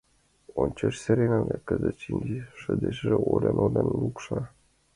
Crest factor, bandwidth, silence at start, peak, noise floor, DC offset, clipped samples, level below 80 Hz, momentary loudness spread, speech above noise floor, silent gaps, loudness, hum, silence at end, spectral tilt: 18 dB; 11.5 kHz; 0.55 s; -8 dBFS; -55 dBFS; under 0.1%; under 0.1%; -48 dBFS; 10 LU; 29 dB; none; -27 LUFS; none; 0.45 s; -8 dB/octave